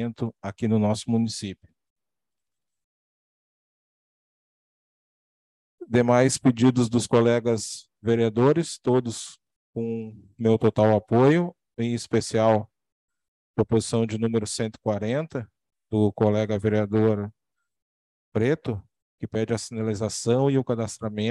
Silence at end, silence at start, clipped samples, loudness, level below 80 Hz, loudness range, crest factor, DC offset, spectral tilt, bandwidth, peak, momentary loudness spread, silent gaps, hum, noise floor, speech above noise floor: 0 s; 0 s; under 0.1%; -24 LUFS; -60 dBFS; 7 LU; 20 dB; under 0.1%; -6 dB/octave; 12 kHz; -6 dBFS; 13 LU; 1.90-1.96 s, 2.84-5.78 s, 9.56-9.73 s, 12.92-13.08 s, 13.28-13.54 s, 17.82-18.32 s, 19.02-19.18 s; none; -90 dBFS; 67 dB